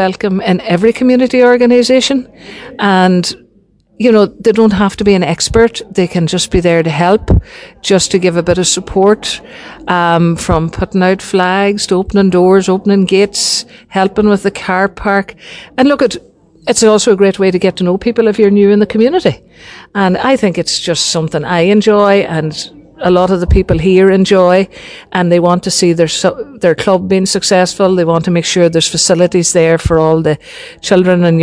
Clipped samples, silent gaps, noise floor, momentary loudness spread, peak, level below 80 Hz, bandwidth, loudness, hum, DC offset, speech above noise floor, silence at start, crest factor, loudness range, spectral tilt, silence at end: 0.6%; none; -50 dBFS; 8 LU; 0 dBFS; -30 dBFS; 10.5 kHz; -11 LUFS; none; under 0.1%; 39 dB; 0 s; 10 dB; 2 LU; -5 dB/octave; 0 s